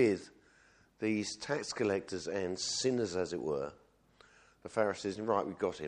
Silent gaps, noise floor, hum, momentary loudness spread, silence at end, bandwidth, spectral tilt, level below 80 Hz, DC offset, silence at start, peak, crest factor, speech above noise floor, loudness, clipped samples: none; -66 dBFS; none; 7 LU; 0 s; 10.5 kHz; -4 dB/octave; -70 dBFS; under 0.1%; 0 s; -16 dBFS; 20 dB; 31 dB; -35 LUFS; under 0.1%